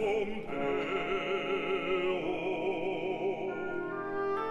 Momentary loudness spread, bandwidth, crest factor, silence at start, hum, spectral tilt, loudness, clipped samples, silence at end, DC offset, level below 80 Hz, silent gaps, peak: 5 LU; 8 kHz; 12 dB; 0 s; none; -6 dB/octave; -33 LUFS; under 0.1%; 0 s; under 0.1%; -58 dBFS; none; -20 dBFS